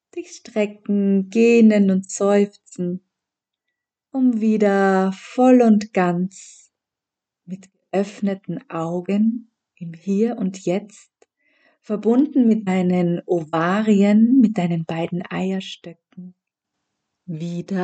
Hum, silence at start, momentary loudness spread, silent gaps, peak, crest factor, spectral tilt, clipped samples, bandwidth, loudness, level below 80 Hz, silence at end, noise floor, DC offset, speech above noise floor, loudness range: none; 0.15 s; 17 LU; none; -4 dBFS; 16 dB; -7 dB/octave; under 0.1%; 8.8 kHz; -19 LUFS; -74 dBFS; 0 s; -86 dBFS; under 0.1%; 67 dB; 8 LU